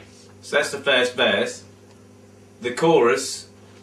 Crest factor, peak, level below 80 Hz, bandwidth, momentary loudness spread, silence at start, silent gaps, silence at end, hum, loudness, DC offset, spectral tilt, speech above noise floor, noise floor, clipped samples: 18 dB; -6 dBFS; -66 dBFS; 14 kHz; 15 LU; 0.45 s; none; 0.35 s; none; -20 LUFS; under 0.1%; -3 dB/octave; 28 dB; -48 dBFS; under 0.1%